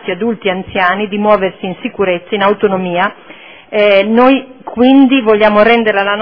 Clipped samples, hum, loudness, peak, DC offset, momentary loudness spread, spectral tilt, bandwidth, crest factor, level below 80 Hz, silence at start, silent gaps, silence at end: 0.4%; none; -11 LUFS; 0 dBFS; under 0.1%; 9 LU; -8.5 dB/octave; 5.4 kHz; 12 dB; -46 dBFS; 0 s; none; 0 s